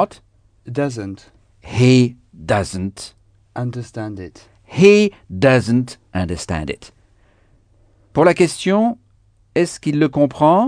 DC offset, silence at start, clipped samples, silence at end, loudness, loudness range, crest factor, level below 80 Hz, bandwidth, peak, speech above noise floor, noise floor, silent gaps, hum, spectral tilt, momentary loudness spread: under 0.1%; 0 s; under 0.1%; 0 s; -17 LUFS; 3 LU; 18 dB; -46 dBFS; 10 kHz; 0 dBFS; 39 dB; -55 dBFS; none; none; -6.5 dB/octave; 19 LU